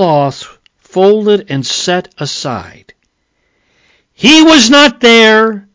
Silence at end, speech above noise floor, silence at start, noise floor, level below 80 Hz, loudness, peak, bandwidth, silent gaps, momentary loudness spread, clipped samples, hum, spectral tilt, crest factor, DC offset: 0.15 s; 53 dB; 0 s; -62 dBFS; -48 dBFS; -8 LUFS; 0 dBFS; 8 kHz; none; 16 LU; 0.9%; none; -3.5 dB/octave; 10 dB; under 0.1%